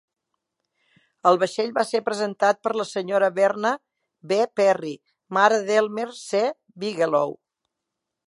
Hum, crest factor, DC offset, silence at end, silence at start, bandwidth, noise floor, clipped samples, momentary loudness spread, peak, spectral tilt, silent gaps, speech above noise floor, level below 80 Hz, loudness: none; 20 dB; under 0.1%; 0.95 s; 1.25 s; 11.5 kHz; -83 dBFS; under 0.1%; 10 LU; -2 dBFS; -4 dB/octave; none; 61 dB; -80 dBFS; -23 LUFS